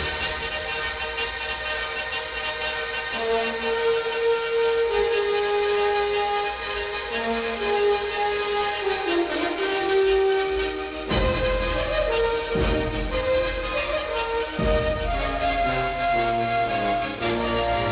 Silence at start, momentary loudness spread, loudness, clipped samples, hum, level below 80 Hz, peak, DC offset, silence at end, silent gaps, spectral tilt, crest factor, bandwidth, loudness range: 0 s; 5 LU; -24 LUFS; under 0.1%; none; -36 dBFS; -10 dBFS; under 0.1%; 0 s; none; -9 dB/octave; 14 dB; 4 kHz; 2 LU